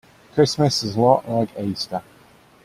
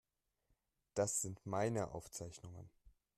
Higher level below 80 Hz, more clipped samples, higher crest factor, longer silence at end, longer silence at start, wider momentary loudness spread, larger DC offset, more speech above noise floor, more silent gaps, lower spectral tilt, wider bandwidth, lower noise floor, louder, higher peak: first, -56 dBFS vs -70 dBFS; neither; about the same, 20 dB vs 20 dB; first, 0.65 s vs 0.3 s; second, 0.35 s vs 0.95 s; second, 10 LU vs 16 LU; neither; second, 32 dB vs 41 dB; neither; about the same, -5.5 dB/octave vs -4.5 dB/octave; first, 15.5 kHz vs 13.5 kHz; second, -51 dBFS vs -83 dBFS; first, -20 LUFS vs -41 LUFS; first, -2 dBFS vs -26 dBFS